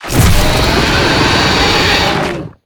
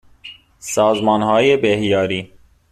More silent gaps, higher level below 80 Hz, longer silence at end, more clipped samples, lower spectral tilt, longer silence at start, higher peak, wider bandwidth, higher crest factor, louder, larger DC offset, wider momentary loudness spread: neither; first, -18 dBFS vs -52 dBFS; second, 0.15 s vs 0.45 s; neither; about the same, -4 dB/octave vs -4.5 dB/octave; second, 0 s vs 0.25 s; about the same, 0 dBFS vs -2 dBFS; first, over 20 kHz vs 14 kHz; second, 10 dB vs 16 dB; first, -10 LUFS vs -16 LUFS; neither; second, 4 LU vs 23 LU